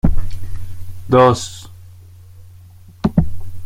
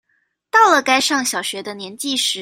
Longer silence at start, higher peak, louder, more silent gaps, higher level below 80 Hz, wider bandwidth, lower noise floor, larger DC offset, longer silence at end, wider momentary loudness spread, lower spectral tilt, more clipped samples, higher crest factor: second, 0.05 s vs 0.55 s; about the same, -2 dBFS vs 0 dBFS; about the same, -17 LUFS vs -16 LUFS; neither; first, -26 dBFS vs -68 dBFS; second, 12 kHz vs 16 kHz; second, -41 dBFS vs -67 dBFS; neither; about the same, 0 s vs 0 s; first, 22 LU vs 14 LU; first, -6.5 dB/octave vs -0.5 dB/octave; neither; about the same, 16 dB vs 18 dB